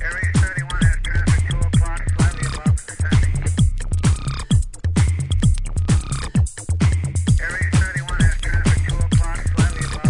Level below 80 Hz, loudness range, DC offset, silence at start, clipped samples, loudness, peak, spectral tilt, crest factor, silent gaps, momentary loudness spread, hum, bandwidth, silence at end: -24 dBFS; 1 LU; under 0.1%; 0 s; under 0.1%; -20 LUFS; -4 dBFS; -5.5 dB/octave; 14 dB; none; 3 LU; none; 11 kHz; 0 s